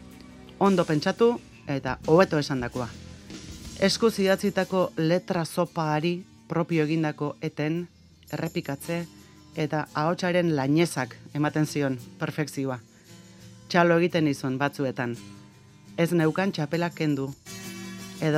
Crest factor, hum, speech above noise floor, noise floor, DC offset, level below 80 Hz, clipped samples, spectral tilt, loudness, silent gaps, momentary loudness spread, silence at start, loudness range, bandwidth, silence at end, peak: 22 dB; none; 25 dB; -51 dBFS; under 0.1%; -58 dBFS; under 0.1%; -6 dB/octave; -26 LUFS; none; 16 LU; 0 s; 4 LU; 15.5 kHz; 0 s; -4 dBFS